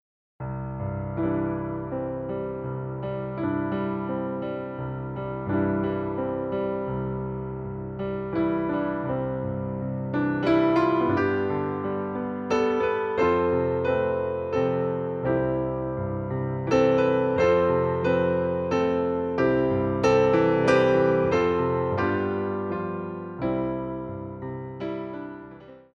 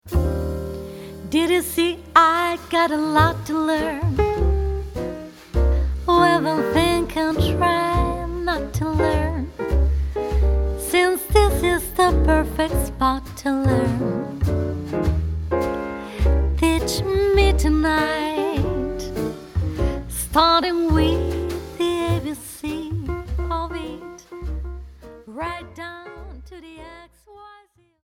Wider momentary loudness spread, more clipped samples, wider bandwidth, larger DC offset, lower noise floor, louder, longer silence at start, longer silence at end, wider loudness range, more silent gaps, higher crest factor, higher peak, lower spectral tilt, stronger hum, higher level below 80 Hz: second, 12 LU vs 15 LU; neither; second, 7.6 kHz vs 16.5 kHz; neither; second, -45 dBFS vs -53 dBFS; second, -26 LUFS vs -21 LUFS; first, 0.4 s vs 0.05 s; second, 0.15 s vs 0.5 s; about the same, 8 LU vs 10 LU; neither; about the same, 18 dB vs 20 dB; second, -8 dBFS vs 0 dBFS; first, -8 dB/octave vs -5.5 dB/octave; neither; second, -50 dBFS vs -26 dBFS